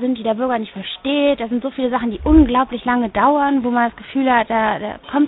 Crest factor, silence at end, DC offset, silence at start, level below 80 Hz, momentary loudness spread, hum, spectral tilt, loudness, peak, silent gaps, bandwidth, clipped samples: 16 dB; 0 s; under 0.1%; 0 s; -32 dBFS; 9 LU; none; -11 dB/octave; -18 LUFS; 0 dBFS; none; 4.1 kHz; under 0.1%